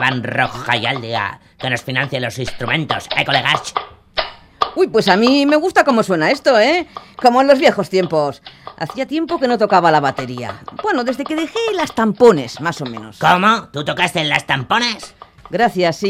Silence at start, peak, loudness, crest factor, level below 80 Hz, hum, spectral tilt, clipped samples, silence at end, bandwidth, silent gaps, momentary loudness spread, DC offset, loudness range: 0 s; 0 dBFS; -16 LUFS; 16 dB; -50 dBFS; none; -5 dB/octave; under 0.1%; 0 s; 16 kHz; none; 13 LU; under 0.1%; 5 LU